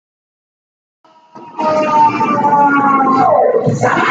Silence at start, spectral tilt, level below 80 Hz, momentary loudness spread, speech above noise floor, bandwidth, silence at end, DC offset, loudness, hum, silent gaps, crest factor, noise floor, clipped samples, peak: 1.35 s; -6.5 dB/octave; -56 dBFS; 5 LU; 25 dB; 7.8 kHz; 0 s; under 0.1%; -12 LUFS; none; none; 12 dB; -37 dBFS; under 0.1%; 0 dBFS